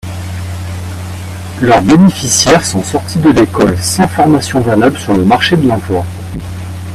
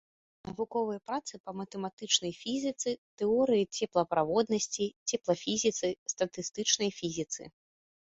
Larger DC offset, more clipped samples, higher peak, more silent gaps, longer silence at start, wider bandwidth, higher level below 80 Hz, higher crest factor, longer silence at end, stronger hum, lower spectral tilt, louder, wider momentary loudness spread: neither; first, 0.2% vs under 0.1%; first, 0 dBFS vs -10 dBFS; second, none vs 1.40-1.44 s, 1.93-1.97 s, 2.98-3.17 s, 4.96-5.06 s, 5.98-6.06 s; second, 0.05 s vs 0.45 s; first, 15 kHz vs 8.2 kHz; first, -36 dBFS vs -70 dBFS; second, 10 dB vs 22 dB; second, 0 s vs 0.7 s; neither; first, -5 dB/octave vs -3 dB/octave; first, -10 LUFS vs -32 LUFS; first, 15 LU vs 11 LU